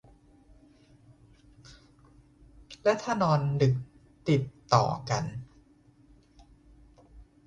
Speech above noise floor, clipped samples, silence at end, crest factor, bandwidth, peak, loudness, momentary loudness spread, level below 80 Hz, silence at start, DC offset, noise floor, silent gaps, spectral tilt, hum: 34 dB; under 0.1%; 0.25 s; 24 dB; 9 kHz; -6 dBFS; -28 LUFS; 14 LU; -58 dBFS; 1.7 s; under 0.1%; -60 dBFS; none; -6.5 dB/octave; none